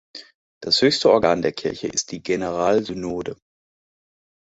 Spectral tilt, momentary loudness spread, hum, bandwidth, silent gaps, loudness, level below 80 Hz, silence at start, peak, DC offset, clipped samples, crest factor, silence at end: -3.5 dB/octave; 17 LU; none; 8.2 kHz; 0.34-0.61 s; -21 LUFS; -54 dBFS; 0.15 s; -2 dBFS; under 0.1%; under 0.1%; 20 dB; 1.25 s